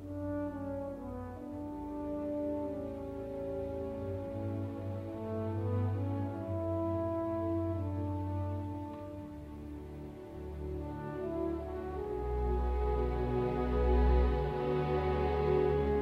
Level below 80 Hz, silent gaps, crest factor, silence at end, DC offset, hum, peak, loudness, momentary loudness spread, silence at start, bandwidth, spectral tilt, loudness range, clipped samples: -40 dBFS; none; 16 dB; 0 s; under 0.1%; none; -18 dBFS; -36 LUFS; 13 LU; 0 s; 5.4 kHz; -9.5 dB/octave; 8 LU; under 0.1%